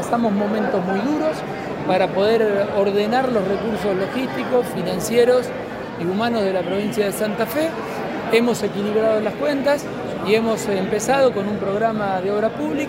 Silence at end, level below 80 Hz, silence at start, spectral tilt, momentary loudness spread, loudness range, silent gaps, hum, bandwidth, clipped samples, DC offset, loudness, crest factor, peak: 0 s; -52 dBFS; 0 s; -5.5 dB/octave; 7 LU; 1 LU; none; none; 16 kHz; under 0.1%; under 0.1%; -20 LUFS; 16 dB; -4 dBFS